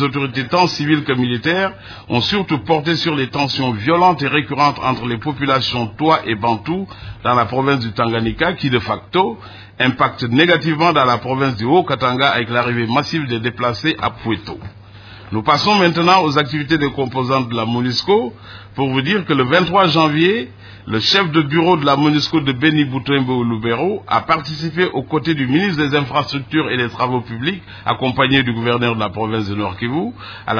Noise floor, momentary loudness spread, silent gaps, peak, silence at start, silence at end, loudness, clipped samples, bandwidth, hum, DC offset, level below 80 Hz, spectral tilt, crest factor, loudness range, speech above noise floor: -38 dBFS; 9 LU; none; 0 dBFS; 0 s; 0 s; -16 LUFS; under 0.1%; 5.4 kHz; none; under 0.1%; -46 dBFS; -6 dB/octave; 16 dB; 3 LU; 21 dB